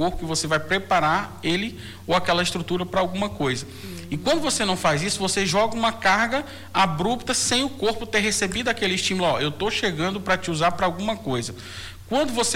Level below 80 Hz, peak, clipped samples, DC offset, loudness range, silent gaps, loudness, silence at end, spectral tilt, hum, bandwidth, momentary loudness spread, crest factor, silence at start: -46 dBFS; -8 dBFS; under 0.1%; under 0.1%; 3 LU; none; -23 LUFS; 0 s; -3.5 dB/octave; none; 19 kHz; 7 LU; 16 dB; 0 s